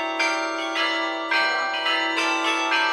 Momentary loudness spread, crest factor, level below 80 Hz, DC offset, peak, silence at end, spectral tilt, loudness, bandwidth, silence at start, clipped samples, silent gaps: 3 LU; 16 dB; -78 dBFS; under 0.1%; -8 dBFS; 0 s; 0 dB/octave; -22 LUFS; 15 kHz; 0 s; under 0.1%; none